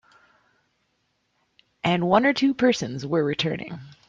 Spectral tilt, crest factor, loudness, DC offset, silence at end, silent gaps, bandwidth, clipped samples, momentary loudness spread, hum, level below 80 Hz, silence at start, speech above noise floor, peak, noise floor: -5.5 dB/octave; 20 dB; -23 LUFS; under 0.1%; 0.15 s; none; 7.6 kHz; under 0.1%; 9 LU; none; -62 dBFS; 1.85 s; 49 dB; -6 dBFS; -72 dBFS